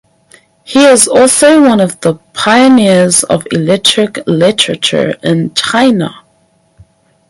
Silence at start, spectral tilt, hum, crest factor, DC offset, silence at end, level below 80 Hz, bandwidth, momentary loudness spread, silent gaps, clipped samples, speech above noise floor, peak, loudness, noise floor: 0.7 s; -3.5 dB/octave; none; 10 dB; under 0.1%; 1.15 s; -50 dBFS; 16 kHz; 8 LU; none; 0.3%; 44 dB; 0 dBFS; -8 LUFS; -52 dBFS